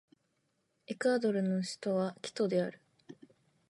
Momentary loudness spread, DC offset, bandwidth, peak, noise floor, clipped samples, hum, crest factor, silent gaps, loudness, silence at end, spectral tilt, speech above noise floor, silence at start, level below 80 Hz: 7 LU; under 0.1%; 11.5 kHz; -18 dBFS; -79 dBFS; under 0.1%; none; 18 dB; none; -33 LUFS; 0.55 s; -6 dB/octave; 46 dB; 0.9 s; -86 dBFS